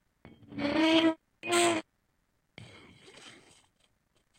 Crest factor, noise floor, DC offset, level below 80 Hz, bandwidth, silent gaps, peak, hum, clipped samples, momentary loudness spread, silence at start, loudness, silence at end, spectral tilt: 22 dB; -75 dBFS; under 0.1%; -68 dBFS; 16 kHz; none; -10 dBFS; none; under 0.1%; 26 LU; 0.5 s; -28 LUFS; 1.1 s; -3 dB/octave